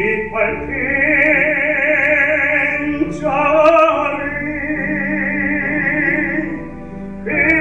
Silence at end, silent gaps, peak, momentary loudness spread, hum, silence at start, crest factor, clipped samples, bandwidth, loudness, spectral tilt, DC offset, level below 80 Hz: 0 s; none; -2 dBFS; 10 LU; none; 0 s; 14 dB; under 0.1%; 8.4 kHz; -15 LUFS; -7 dB/octave; 1%; -40 dBFS